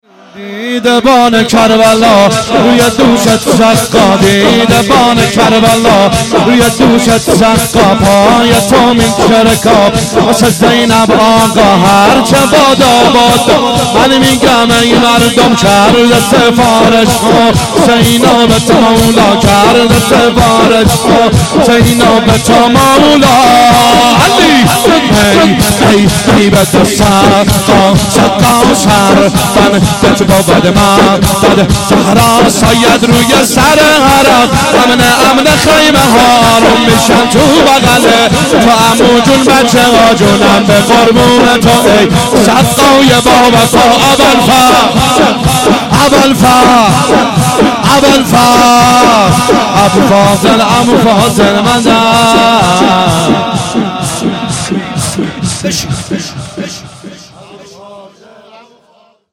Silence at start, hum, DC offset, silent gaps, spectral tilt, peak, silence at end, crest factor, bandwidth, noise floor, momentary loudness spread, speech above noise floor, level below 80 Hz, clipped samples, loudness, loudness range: 0.35 s; none; under 0.1%; none; -4 dB/octave; 0 dBFS; 1.3 s; 6 dB; 17 kHz; -46 dBFS; 3 LU; 41 dB; -28 dBFS; 0.2%; -5 LUFS; 2 LU